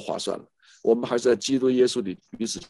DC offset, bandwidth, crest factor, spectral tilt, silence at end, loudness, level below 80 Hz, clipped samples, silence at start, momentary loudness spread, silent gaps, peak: under 0.1%; 11.5 kHz; 16 dB; -4 dB/octave; 0.05 s; -24 LUFS; -62 dBFS; under 0.1%; 0 s; 11 LU; none; -8 dBFS